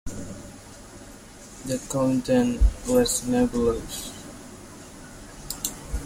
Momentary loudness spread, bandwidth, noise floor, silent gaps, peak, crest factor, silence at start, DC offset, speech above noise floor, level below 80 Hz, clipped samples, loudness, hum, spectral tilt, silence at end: 22 LU; 16.5 kHz; -44 dBFS; none; -6 dBFS; 20 dB; 0.05 s; under 0.1%; 22 dB; -34 dBFS; under 0.1%; -25 LUFS; 50 Hz at -45 dBFS; -5 dB/octave; 0 s